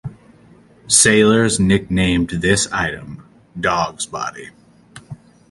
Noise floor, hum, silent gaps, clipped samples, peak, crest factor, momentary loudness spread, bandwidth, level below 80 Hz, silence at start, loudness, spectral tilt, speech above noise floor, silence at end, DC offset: -48 dBFS; none; none; under 0.1%; 0 dBFS; 18 dB; 25 LU; 11.5 kHz; -40 dBFS; 0.05 s; -16 LUFS; -3.5 dB/octave; 31 dB; 0.35 s; under 0.1%